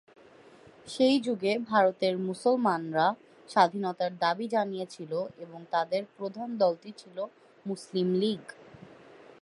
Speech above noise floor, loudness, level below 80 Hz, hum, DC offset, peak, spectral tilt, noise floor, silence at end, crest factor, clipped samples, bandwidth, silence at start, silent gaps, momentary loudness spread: 26 dB; -29 LUFS; -78 dBFS; none; under 0.1%; -8 dBFS; -5.5 dB/octave; -55 dBFS; 0.9 s; 20 dB; under 0.1%; 11.5 kHz; 0.85 s; none; 15 LU